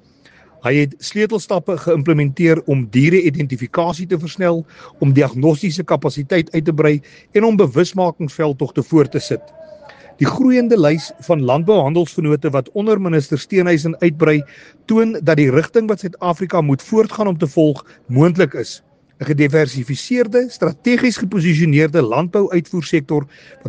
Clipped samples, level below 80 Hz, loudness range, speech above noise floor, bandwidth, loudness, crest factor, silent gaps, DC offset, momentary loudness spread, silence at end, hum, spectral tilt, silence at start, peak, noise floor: under 0.1%; -56 dBFS; 2 LU; 33 dB; 9.4 kHz; -16 LUFS; 16 dB; none; under 0.1%; 8 LU; 0 s; none; -7 dB/octave; 0.65 s; 0 dBFS; -49 dBFS